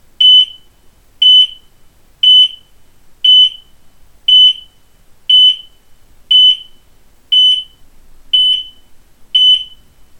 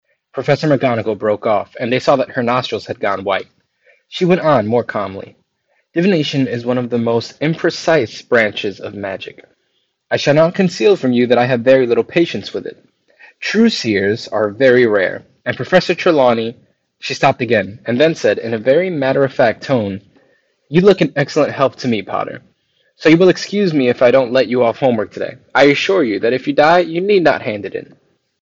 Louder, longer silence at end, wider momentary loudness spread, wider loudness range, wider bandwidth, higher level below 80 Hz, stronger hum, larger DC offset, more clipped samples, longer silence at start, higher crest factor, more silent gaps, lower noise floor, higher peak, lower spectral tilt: first, -7 LUFS vs -15 LUFS; about the same, 0.55 s vs 0.6 s; about the same, 11 LU vs 13 LU; about the same, 3 LU vs 4 LU; first, 13 kHz vs 7.8 kHz; first, -48 dBFS vs -58 dBFS; neither; neither; neither; second, 0.2 s vs 0.35 s; about the same, 12 dB vs 14 dB; neither; second, -45 dBFS vs -66 dBFS; about the same, 0 dBFS vs 0 dBFS; second, 2 dB/octave vs -6 dB/octave